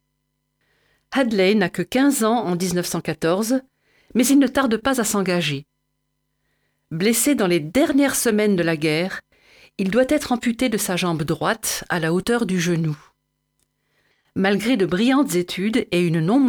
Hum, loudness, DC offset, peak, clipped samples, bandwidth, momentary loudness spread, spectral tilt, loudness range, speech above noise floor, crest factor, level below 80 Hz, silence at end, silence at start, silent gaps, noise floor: none; -20 LUFS; under 0.1%; -6 dBFS; under 0.1%; over 20 kHz; 8 LU; -4.5 dB/octave; 3 LU; 54 dB; 14 dB; -54 dBFS; 0 s; 1.1 s; none; -74 dBFS